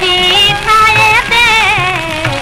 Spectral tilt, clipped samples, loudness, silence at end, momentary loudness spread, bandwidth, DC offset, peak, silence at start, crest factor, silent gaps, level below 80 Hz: -2.5 dB/octave; under 0.1%; -7 LUFS; 0 s; 7 LU; 16.5 kHz; 0.6%; -2 dBFS; 0 s; 8 dB; none; -30 dBFS